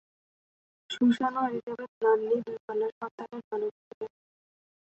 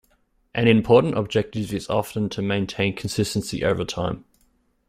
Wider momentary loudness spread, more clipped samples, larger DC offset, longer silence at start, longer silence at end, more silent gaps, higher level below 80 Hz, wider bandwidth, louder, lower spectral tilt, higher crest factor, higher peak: first, 17 LU vs 10 LU; neither; neither; first, 0.9 s vs 0.55 s; first, 0.9 s vs 0.7 s; first, 1.63-1.67 s, 1.88-2.01 s, 2.60-2.68 s, 2.92-3.01 s, 3.11-3.18 s, 3.44-3.51 s, 3.71-4.01 s vs none; second, -78 dBFS vs -50 dBFS; second, 8.2 kHz vs 16 kHz; second, -30 LUFS vs -23 LUFS; about the same, -6 dB/octave vs -6 dB/octave; about the same, 18 dB vs 20 dB; second, -14 dBFS vs -4 dBFS